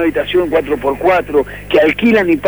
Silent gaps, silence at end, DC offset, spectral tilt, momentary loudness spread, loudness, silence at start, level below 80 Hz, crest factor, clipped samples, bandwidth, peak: none; 0 s; 0.3%; -6.5 dB/octave; 6 LU; -13 LUFS; 0 s; -38 dBFS; 12 dB; under 0.1%; over 20 kHz; -2 dBFS